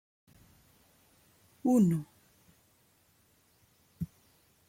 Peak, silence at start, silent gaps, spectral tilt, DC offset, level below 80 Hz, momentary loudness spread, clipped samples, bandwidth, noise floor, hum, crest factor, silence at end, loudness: -16 dBFS; 1.65 s; none; -8.5 dB/octave; under 0.1%; -68 dBFS; 17 LU; under 0.1%; 16.5 kHz; -68 dBFS; none; 20 dB; 0.65 s; -31 LUFS